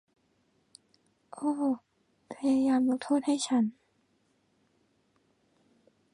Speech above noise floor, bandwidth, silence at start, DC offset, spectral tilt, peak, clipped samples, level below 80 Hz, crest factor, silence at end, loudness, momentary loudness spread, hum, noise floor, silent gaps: 44 dB; 11 kHz; 1.35 s; under 0.1%; -4.5 dB/octave; -16 dBFS; under 0.1%; -76 dBFS; 16 dB; 2.4 s; -29 LUFS; 9 LU; none; -72 dBFS; none